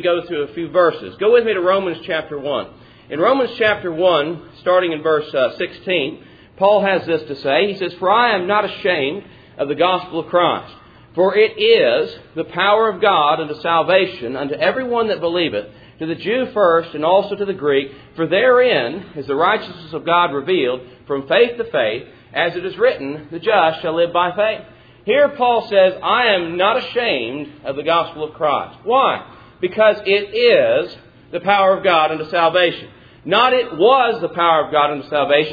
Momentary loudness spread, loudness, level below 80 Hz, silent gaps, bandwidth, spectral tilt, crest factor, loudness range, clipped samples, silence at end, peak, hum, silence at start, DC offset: 11 LU; -17 LUFS; -56 dBFS; none; 5 kHz; -7 dB/octave; 16 dB; 3 LU; under 0.1%; 0 s; 0 dBFS; none; 0 s; under 0.1%